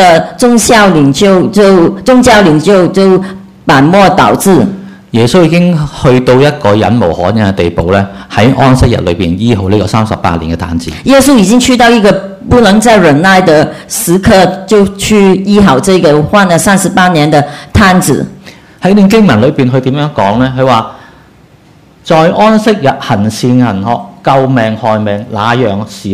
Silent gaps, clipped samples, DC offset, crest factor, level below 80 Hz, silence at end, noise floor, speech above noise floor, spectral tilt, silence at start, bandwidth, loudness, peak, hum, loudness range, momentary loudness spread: none; 5%; under 0.1%; 6 dB; -30 dBFS; 0 s; -39 dBFS; 33 dB; -5.5 dB/octave; 0 s; 16 kHz; -7 LUFS; 0 dBFS; none; 4 LU; 8 LU